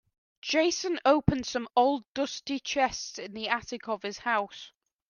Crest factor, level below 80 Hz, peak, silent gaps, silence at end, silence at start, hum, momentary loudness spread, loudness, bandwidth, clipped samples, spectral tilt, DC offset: 22 dB; -52 dBFS; -8 dBFS; 2.08-2.15 s; 0.4 s; 0.45 s; none; 12 LU; -29 LUFS; 10 kHz; under 0.1%; -4 dB/octave; under 0.1%